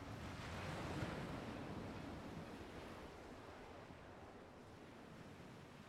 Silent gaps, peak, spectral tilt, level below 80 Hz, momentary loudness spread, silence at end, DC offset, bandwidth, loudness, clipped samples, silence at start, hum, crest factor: none; -32 dBFS; -6 dB/octave; -64 dBFS; 11 LU; 0 s; under 0.1%; 16 kHz; -52 LUFS; under 0.1%; 0 s; none; 20 dB